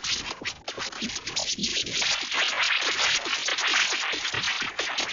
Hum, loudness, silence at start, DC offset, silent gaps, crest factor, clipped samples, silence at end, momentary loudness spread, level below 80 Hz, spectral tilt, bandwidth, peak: none; -25 LUFS; 0 s; under 0.1%; none; 16 dB; under 0.1%; 0 s; 9 LU; -58 dBFS; 0 dB/octave; 8 kHz; -10 dBFS